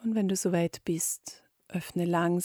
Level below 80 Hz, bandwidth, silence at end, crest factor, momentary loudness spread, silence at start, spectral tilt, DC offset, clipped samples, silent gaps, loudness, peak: -68 dBFS; 19 kHz; 0 s; 14 dB; 10 LU; 0 s; -5 dB/octave; under 0.1%; under 0.1%; none; -30 LUFS; -16 dBFS